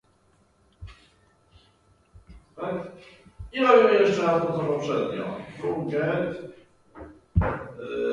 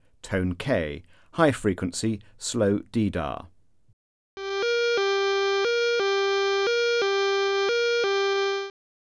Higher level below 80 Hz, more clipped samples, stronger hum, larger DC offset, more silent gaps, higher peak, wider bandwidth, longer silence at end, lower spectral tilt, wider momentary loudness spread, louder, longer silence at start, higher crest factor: first, -44 dBFS vs -52 dBFS; neither; neither; neither; second, none vs 3.93-4.37 s; about the same, -4 dBFS vs -6 dBFS; about the same, 10.5 kHz vs 11 kHz; second, 0 s vs 0.4 s; first, -7 dB/octave vs -4.5 dB/octave; first, 26 LU vs 9 LU; about the same, -25 LUFS vs -25 LUFS; first, 0.8 s vs 0.25 s; about the same, 22 dB vs 20 dB